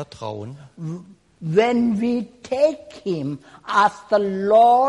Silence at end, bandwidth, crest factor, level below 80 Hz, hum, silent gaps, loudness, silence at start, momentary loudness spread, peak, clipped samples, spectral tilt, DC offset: 0 s; 11 kHz; 14 dB; -60 dBFS; none; none; -20 LUFS; 0 s; 17 LU; -6 dBFS; under 0.1%; -6.5 dB/octave; under 0.1%